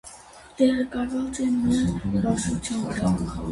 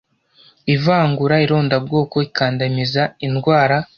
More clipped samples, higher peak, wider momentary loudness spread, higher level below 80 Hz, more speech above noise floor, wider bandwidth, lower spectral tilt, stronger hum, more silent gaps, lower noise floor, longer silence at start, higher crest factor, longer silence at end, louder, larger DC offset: neither; second, -8 dBFS vs -2 dBFS; about the same, 6 LU vs 5 LU; first, -42 dBFS vs -52 dBFS; second, 22 dB vs 36 dB; first, 11.5 kHz vs 6.6 kHz; second, -6 dB/octave vs -7.5 dB/octave; neither; neither; second, -46 dBFS vs -52 dBFS; second, 0.05 s vs 0.65 s; about the same, 16 dB vs 16 dB; about the same, 0 s vs 0.1 s; second, -25 LUFS vs -17 LUFS; neither